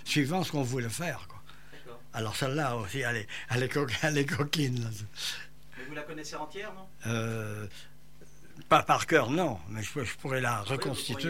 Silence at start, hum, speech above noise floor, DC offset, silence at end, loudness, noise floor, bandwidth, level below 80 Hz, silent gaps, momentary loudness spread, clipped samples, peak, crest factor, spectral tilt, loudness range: 0 s; none; 25 dB; 0.6%; 0 s; -31 LUFS; -56 dBFS; 16 kHz; -60 dBFS; none; 17 LU; under 0.1%; -10 dBFS; 22 dB; -4.5 dB/octave; 8 LU